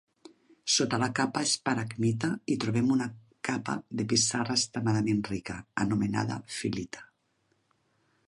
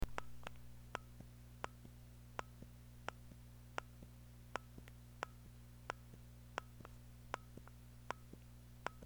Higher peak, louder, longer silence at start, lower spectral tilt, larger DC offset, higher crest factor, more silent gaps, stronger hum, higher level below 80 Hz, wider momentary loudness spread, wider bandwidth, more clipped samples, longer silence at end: first, -10 dBFS vs -20 dBFS; first, -29 LUFS vs -54 LUFS; first, 0.65 s vs 0 s; about the same, -4 dB/octave vs -4.5 dB/octave; neither; second, 20 dB vs 32 dB; neither; second, none vs 60 Hz at -60 dBFS; about the same, -62 dBFS vs -60 dBFS; about the same, 11 LU vs 9 LU; second, 11.5 kHz vs over 20 kHz; neither; first, 1.25 s vs 0 s